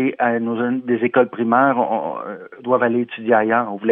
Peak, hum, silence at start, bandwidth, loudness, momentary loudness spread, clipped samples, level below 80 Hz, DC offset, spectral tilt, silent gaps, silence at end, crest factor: -2 dBFS; none; 0 s; 3.8 kHz; -18 LUFS; 9 LU; under 0.1%; -78 dBFS; under 0.1%; -10 dB/octave; none; 0 s; 16 dB